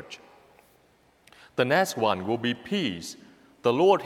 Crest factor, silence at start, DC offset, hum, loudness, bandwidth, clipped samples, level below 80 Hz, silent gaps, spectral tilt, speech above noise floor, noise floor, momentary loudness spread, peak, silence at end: 20 dB; 0 s; under 0.1%; none; -26 LUFS; 16 kHz; under 0.1%; -70 dBFS; none; -4.5 dB/octave; 38 dB; -62 dBFS; 20 LU; -8 dBFS; 0 s